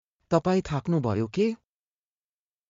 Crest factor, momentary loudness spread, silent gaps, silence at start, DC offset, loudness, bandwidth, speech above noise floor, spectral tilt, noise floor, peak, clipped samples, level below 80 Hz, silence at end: 20 dB; 4 LU; none; 0.3 s; under 0.1%; -27 LUFS; 7.6 kHz; over 65 dB; -7.5 dB/octave; under -90 dBFS; -10 dBFS; under 0.1%; -56 dBFS; 1.15 s